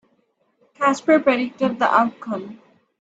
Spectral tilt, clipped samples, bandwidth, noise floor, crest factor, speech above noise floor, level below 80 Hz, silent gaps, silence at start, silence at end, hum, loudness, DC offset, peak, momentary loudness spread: -5 dB/octave; under 0.1%; 8 kHz; -66 dBFS; 18 dB; 46 dB; -66 dBFS; none; 0.8 s; 0.45 s; none; -20 LUFS; under 0.1%; -2 dBFS; 13 LU